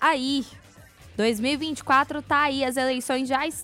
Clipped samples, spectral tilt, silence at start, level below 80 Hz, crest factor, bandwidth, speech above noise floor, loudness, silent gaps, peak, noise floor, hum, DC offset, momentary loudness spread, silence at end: under 0.1%; -3 dB/octave; 0 s; -56 dBFS; 16 dB; 16 kHz; 25 dB; -24 LUFS; none; -8 dBFS; -49 dBFS; none; under 0.1%; 7 LU; 0 s